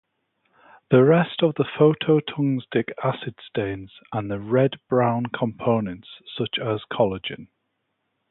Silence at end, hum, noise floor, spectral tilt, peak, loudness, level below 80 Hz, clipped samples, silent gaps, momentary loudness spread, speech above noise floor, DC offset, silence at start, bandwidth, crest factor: 0.85 s; none; -75 dBFS; -11.5 dB/octave; -4 dBFS; -23 LUFS; -58 dBFS; under 0.1%; none; 14 LU; 53 dB; under 0.1%; 0.9 s; 4.1 kHz; 20 dB